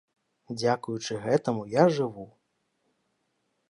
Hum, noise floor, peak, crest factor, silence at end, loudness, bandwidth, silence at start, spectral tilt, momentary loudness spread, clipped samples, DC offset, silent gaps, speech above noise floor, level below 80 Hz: none; -76 dBFS; -8 dBFS; 22 dB; 1.45 s; -27 LUFS; 11 kHz; 0.5 s; -6 dB/octave; 11 LU; under 0.1%; under 0.1%; none; 49 dB; -72 dBFS